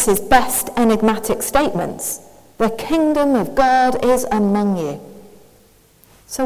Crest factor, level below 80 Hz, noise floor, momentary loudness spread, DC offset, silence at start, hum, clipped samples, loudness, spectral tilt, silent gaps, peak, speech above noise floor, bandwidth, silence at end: 18 dB; -42 dBFS; -51 dBFS; 10 LU; under 0.1%; 0 s; none; under 0.1%; -17 LUFS; -4.5 dB/octave; none; 0 dBFS; 35 dB; 16 kHz; 0 s